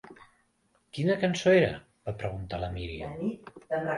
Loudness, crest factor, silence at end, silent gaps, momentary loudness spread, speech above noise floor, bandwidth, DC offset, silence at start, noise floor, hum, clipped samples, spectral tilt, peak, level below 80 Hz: -29 LUFS; 20 dB; 0 s; none; 17 LU; 42 dB; 11.5 kHz; under 0.1%; 0.05 s; -70 dBFS; none; under 0.1%; -6 dB/octave; -10 dBFS; -50 dBFS